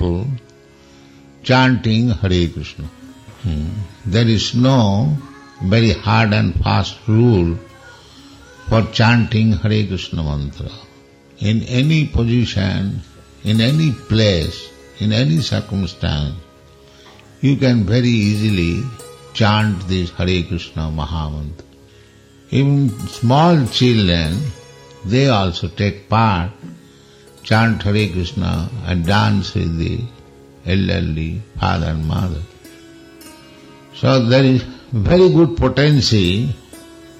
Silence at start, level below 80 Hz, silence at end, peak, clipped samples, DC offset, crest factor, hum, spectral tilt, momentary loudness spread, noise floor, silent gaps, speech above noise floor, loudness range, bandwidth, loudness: 0 s; -34 dBFS; 0.15 s; -2 dBFS; under 0.1%; under 0.1%; 14 dB; none; -6.5 dB/octave; 14 LU; -45 dBFS; none; 30 dB; 5 LU; 12.5 kHz; -17 LUFS